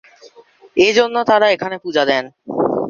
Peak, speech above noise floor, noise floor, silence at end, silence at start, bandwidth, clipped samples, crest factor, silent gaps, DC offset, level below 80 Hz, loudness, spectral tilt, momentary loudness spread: -2 dBFS; 31 dB; -46 dBFS; 0 s; 0.25 s; 7.4 kHz; under 0.1%; 16 dB; none; under 0.1%; -58 dBFS; -16 LUFS; -4 dB/octave; 8 LU